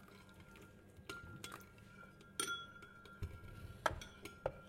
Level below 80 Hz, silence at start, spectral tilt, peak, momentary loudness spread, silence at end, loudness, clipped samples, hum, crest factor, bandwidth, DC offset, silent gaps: -62 dBFS; 0 s; -3 dB/octave; -18 dBFS; 18 LU; 0 s; -47 LUFS; under 0.1%; none; 32 dB; 16.5 kHz; under 0.1%; none